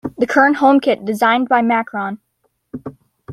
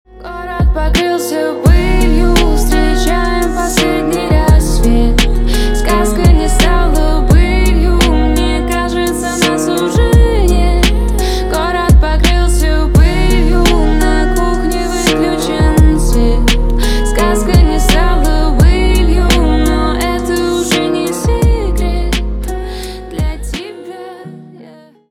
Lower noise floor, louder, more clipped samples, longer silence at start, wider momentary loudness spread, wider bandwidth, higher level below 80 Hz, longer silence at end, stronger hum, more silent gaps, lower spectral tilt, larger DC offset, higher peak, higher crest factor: first, -54 dBFS vs -38 dBFS; second, -15 LUFS vs -12 LUFS; neither; about the same, 0.05 s vs 0.15 s; first, 21 LU vs 7 LU; second, 14 kHz vs 15.5 kHz; second, -60 dBFS vs -12 dBFS; second, 0 s vs 0.45 s; neither; neither; about the same, -5.5 dB/octave vs -5.5 dB/octave; neither; about the same, -2 dBFS vs 0 dBFS; about the same, 14 dB vs 10 dB